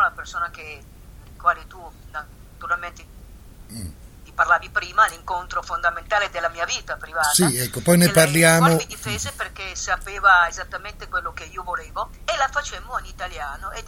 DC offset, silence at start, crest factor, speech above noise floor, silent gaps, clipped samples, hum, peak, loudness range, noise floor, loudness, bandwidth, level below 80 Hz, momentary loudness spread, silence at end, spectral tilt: under 0.1%; 0 s; 22 dB; 20 dB; none; under 0.1%; none; 0 dBFS; 11 LU; -42 dBFS; -21 LUFS; 17.5 kHz; -42 dBFS; 20 LU; 0 s; -3.5 dB/octave